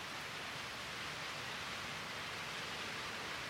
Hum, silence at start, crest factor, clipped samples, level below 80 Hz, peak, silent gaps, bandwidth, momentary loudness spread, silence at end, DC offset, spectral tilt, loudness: none; 0 s; 14 dB; under 0.1%; -68 dBFS; -30 dBFS; none; 16 kHz; 1 LU; 0 s; under 0.1%; -2 dB/octave; -43 LUFS